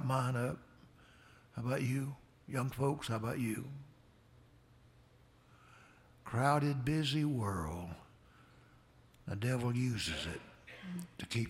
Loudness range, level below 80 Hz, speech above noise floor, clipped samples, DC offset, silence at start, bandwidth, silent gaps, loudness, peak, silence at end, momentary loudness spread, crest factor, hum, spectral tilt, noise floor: 5 LU; -62 dBFS; 29 dB; under 0.1%; under 0.1%; 0 s; 16 kHz; none; -37 LUFS; -18 dBFS; 0 s; 17 LU; 22 dB; none; -6 dB/octave; -65 dBFS